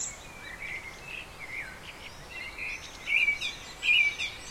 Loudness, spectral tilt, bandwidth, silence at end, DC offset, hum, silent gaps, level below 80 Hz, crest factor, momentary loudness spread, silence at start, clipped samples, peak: -29 LUFS; 0 dB/octave; 16.5 kHz; 0 s; under 0.1%; none; none; -54 dBFS; 18 dB; 20 LU; 0 s; under 0.1%; -14 dBFS